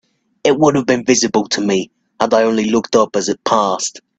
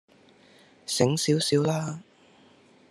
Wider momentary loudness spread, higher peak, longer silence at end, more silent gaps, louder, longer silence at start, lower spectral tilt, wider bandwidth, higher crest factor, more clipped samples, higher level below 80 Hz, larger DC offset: second, 6 LU vs 17 LU; first, 0 dBFS vs -6 dBFS; second, 0.2 s vs 0.9 s; neither; first, -15 LUFS vs -25 LUFS; second, 0.45 s vs 0.9 s; about the same, -4 dB/octave vs -4.5 dB/octave; second, 9.2 kHz vs 13 kHz; second, 16 dB vs 24 dB; neither; first, -56 dBFS vs -70 dBFS; neither